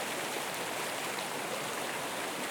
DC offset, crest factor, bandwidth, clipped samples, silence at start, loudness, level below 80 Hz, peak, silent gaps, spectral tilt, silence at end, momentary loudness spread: under 0.1%; 16 dB; 19 kHz; under 0.1%; 0 s; -35 LUFS; -78 dBFS; -20 dBFS; none; -1.5 dB/octave; 0 s; 1 LU